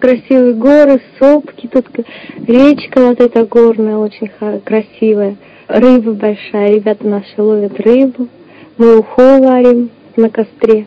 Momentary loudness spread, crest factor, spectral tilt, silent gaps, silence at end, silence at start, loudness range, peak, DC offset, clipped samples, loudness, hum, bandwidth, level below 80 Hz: 12 LU; 10 dB; -8 dB/octave; none; 0 s; 0 s; 3 LU; 0 dBFS; under 0.1%; 4%; -10 LUFS; none; 8 kHz; -50 dBFS